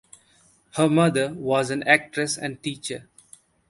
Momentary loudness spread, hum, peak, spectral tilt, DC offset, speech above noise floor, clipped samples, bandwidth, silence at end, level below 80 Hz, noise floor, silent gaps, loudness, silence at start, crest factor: 14 LU; none; 0 dBFS; -4.5 dB/octave; under 0.1%; 37 dB; under 0.1%; 12 kHz; 0.7 s; -64 dBFS; -60 dBFS; none; -23 LUFS; 0.75 s; 24 dB